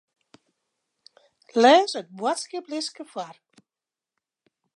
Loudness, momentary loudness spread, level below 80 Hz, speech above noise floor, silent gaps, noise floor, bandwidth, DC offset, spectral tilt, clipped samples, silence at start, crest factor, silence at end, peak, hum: -22 LUFS; 20 LU; -86 dBFS; over 67 dB; none; under -90 dBFS; 11.5 kHz; under 0.1%; -2.5 dB/octave; under 0.1%; 1.55 s; 22 dB; 1.45 s; -4 dBFS; none